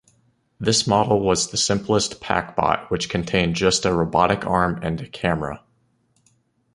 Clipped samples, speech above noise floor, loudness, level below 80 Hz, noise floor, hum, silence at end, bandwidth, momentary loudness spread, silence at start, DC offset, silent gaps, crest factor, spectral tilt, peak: under 0.1%; 44 dB; -21 LUFS; -44 dBFS; -64 dBFS; none; 1.15 s; 11.5 kHz; 8 LU; 0.6 s; under 0.1%; none; 20 dB; -4 dB/octave; -2 dBFS